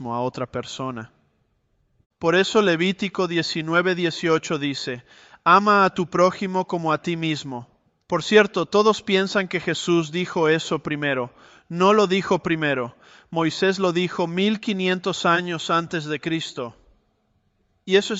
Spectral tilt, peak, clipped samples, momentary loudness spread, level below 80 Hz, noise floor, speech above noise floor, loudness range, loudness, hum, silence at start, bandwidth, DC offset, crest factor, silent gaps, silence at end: -5 dB/octave; -4 dBFS; under 0.1%; 13 LU; -62 dBFS; -67 dBFS; 46 dB; 3 LU; -21 LUFS; none; 0 s; 8.2 kHz; under 0.1%; 18 dB; 2.06-2.10 s; 0 s